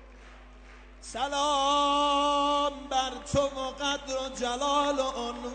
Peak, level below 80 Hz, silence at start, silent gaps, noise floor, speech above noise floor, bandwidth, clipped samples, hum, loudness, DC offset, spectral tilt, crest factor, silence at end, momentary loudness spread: -14 dBFS; -50 dBFS; 0 s; none; -49 dBFS; 21 dB; 9 kHz; under 0.1%; none; -28 LUFS; under 0.1%; -3 dB/octave; 14 dB; 0 s; 9 LU